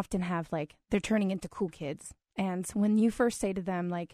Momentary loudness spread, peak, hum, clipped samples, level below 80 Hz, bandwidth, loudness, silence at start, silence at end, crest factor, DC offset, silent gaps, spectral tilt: 11 LU; -14 dBFS; none; under 0.1%; -56 dBFS; 13.5 kHz; -31 LUFS; 0 s; 0.05 s; 18 dB; under 0.1%; none; -6 dB/octave